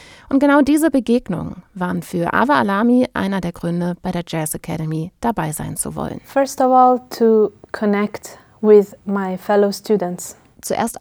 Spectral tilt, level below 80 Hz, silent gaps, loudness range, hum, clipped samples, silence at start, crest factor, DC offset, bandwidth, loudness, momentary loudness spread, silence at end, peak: -6 dB/octave; -48 dBFS; none; 5 LU; none; under 0.1%; 0.3 s; 16 dB; under 0.1%; over 20 kHz; -18 LUFS; 12 LU; 0.05 s; -2 dBFS